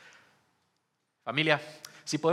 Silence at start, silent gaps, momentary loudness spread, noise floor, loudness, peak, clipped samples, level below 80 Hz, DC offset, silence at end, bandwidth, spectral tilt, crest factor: 1.25 s; none; 17 LU; -78 dBFS; -29 LUFS; -6 dBFS; under 0.1%; -88 dBFS; under 0.1%; 0 s; 15 kHz; -4 dB/octave; 26 dB